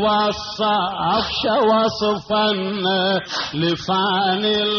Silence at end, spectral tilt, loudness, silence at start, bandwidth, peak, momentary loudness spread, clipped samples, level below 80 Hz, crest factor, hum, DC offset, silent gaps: 0 s; -2.5 dB/octave; -19 LUFS; 0 s; 6.8 kHz; -8 dBFS; 5 LU; under 0.1%; -50 dBFS; 12 dB; none; under 0.1%; none